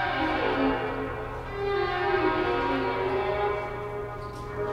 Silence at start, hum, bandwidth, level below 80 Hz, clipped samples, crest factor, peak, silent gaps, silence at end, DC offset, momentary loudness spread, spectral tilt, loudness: 0 s; none; 12.5 kHz; -44 dBFS; under 0.1%; 16 dB; -12 dBFS; none; 0 s; under 0.1%; 10 LU; -6.5 dB/octave; -28 LUFS